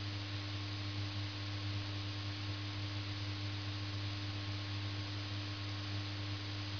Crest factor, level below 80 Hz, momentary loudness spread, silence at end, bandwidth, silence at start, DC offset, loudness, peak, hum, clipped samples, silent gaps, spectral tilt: 12 dB; -64 dBFS; 1 LU; 0 s; 5.4 kHz; 0 s; under 0.1%; -41 LUFS; -30 dBFS; none; under 0.1%; none; -4 dB/octave